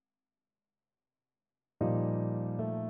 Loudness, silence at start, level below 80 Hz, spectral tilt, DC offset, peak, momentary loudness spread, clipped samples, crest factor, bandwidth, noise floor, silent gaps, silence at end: -33 LUFS; 1.8 s; -66 dBFS; -12.5 dB/octave; under 0.1%; -18 dBFS; 4 LU; under 0.1%; 18 dB; 2.7 kHz; under -90 dBFS; none; 0 s